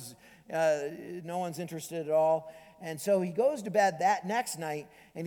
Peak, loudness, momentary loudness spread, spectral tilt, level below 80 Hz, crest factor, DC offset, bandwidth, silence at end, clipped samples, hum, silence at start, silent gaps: -12 dBFS; -31 LUFS; 15 LU; -4.5 dB/octave; -76 dBFS; 18 dB; under 0.1%; 19 kHz; 0 s; under 0.1%; none; 0 s; none